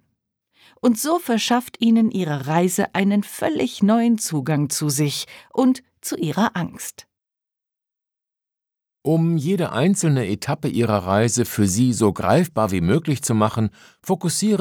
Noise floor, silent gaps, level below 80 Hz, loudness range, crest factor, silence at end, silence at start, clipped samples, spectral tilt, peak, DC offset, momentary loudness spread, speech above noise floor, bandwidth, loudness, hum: -87 dBFS; none; -54 dBFS; 6 LU; 18 dB; 0 s; 0.85 s; under 0.1%; -5.5 dB/octave; -2 dBFS; under 0.1%; 8 LU; 67 dB; 19.5 kHz; -20 LUFS; none